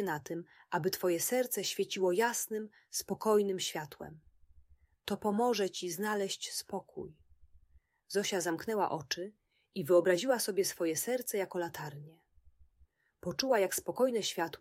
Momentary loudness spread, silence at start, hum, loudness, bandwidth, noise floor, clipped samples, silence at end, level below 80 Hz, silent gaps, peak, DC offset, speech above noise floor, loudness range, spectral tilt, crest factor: 14 LU; 0 s; none; -33 LUFS; 16 kHz; -69 dBFS; under 0.1%; 0.05 s; -72 dBFS; none; -14 dBFS; under 0.1%; 35 dB; 4 LU; -3.5 dB/octave; 20 dB